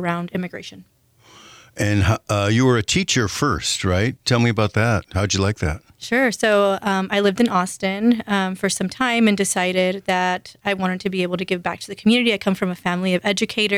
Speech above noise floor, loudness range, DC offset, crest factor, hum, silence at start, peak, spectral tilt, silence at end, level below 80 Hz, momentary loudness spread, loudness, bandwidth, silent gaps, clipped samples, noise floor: 29 dB; 2 LU; under 0.1%; 14 dB; none; 0 s; -6 dBFS; -4.5 dB/octave; 0 s; -46 dBFS; 8 LU; -20 LUFS; 16 kHz; none; under 0.1%; -49 dBFS